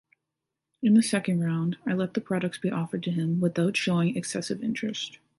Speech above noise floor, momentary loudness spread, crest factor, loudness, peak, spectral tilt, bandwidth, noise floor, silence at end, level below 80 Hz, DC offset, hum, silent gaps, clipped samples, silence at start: 59 dB; 9 LU; 16 dB; -27 LUFS; -12 dBFS; -5.5 dB/octave; 11.5 kHz; -85 dBFS; 0.25 s; -70 dBFS; under 0.1%; none; none; under 0.1%; 0.8 s